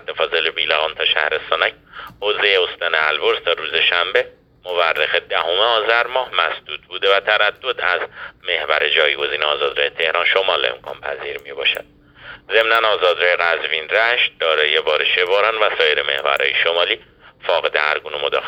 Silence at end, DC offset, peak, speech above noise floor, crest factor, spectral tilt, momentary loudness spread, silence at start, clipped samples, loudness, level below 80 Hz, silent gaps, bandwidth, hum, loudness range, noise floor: 0 s; under 0.1%; 0 dBFS; 22 dB; 18 dB; -2.5 dB/octave; 9 LU; 0.1 s; under 0.1%; -17 LUFS; -58 dBFS; none; 16.5 kHz; none; 2 LU; -40 dBFS